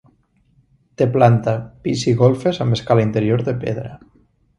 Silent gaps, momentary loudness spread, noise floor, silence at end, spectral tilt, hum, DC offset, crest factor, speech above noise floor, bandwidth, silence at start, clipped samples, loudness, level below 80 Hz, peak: none; 10 LU; -58 dBFS; 0.6 s; -7 dB/octave; none; under 0.1%; 18 dB; 42 dB; 10 kHz; 1 s; under 0.1%; -18 LUFS; -50 dBFS; 0 dBFS